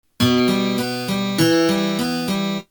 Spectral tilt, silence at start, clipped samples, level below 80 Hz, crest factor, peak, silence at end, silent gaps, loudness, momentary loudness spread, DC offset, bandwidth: -5 dB/octave; 0.2 s; under 0.1%; -52 dBFS; 16 dB; -4 dBFS; 0.1 s; none; -19 LUFS; 6 LU; under 0.1%; over 20 kHz